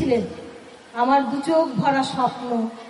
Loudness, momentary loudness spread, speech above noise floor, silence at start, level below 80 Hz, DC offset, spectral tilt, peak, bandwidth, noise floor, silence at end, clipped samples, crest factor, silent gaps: -21 LUFS; 15 LU; 20 dB; 0 s; -60 dBFS; under 0.1%; -6 dB/octave; -8 dBFS; 11.5 kHz; -42 dBFS; 0 s; under 0.1%; 14 dB; none